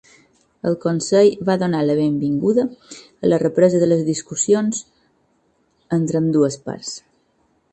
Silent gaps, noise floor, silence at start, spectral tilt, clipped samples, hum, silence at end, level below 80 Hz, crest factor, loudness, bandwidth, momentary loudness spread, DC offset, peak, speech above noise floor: none; -63 dBFS; 0.65 s; -6 dB/octave; under 0.1%; none; 0.75 s; -60 dBFS; 18 dB; -19 LUFS; 9.2 kHz; 14 LU; under 0.1%; -2 dBFS; 45 dB